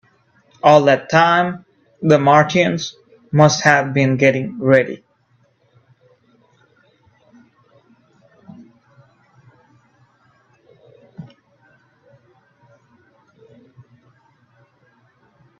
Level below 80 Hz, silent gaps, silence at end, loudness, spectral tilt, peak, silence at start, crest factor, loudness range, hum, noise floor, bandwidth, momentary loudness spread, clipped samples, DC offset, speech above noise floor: -60 dBFS; none; 4.35 s; -15 LUFS; -5.5 dB/octave; 0 dBFS; 0.65 s; 20 dB; 8 LU; none; -60 dBFS; 8.2 kHz; 16 LU; under 0.1%; under 0.1%; 46 dB